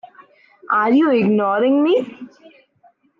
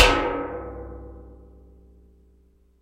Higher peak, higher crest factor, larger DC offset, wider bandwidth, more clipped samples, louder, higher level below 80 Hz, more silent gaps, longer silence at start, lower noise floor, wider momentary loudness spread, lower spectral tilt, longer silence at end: second, -6 dBFS vs 0 dBFS; second, 12 dB vs 26 dB; neither; second, 5.4 kHz vs 16 kHz; neither; first, -16 LUFS vs -25 LUFS; second, -68 dBFS vs -36 dBFS; neither; first, 0.7 s vs 0 s; about the same, -56 dBFS vs -58 dBFS; second, 6 LU vs 26 LU; first, -8.5 dB/octave vs -3.5 dB/octave; second, 0.9 s vs 1.45 s